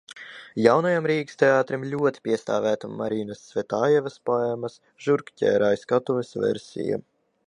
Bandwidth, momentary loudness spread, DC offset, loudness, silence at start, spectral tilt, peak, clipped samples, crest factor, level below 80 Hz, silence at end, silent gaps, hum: 10.5 kHz; 11 LU; under 0.1%; -24 LUFS; 0.1 s; -6.5 dB/octave; -2 dBFS; under 0.1%; 22 dB; -68 dBFS; 0.5 s; none; none